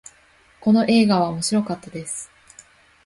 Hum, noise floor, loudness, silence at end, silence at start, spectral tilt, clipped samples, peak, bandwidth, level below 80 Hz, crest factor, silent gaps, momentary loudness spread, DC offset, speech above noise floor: none; -55 dBFS; -20 LUFS; 0.8 s; 0.6 s; -5 dB/octave; under 0.1%; -6 dBFS; 11.5 kHz; -58 dBFS; 16 dB; none; 14 LU; under 0.1%; 36 dB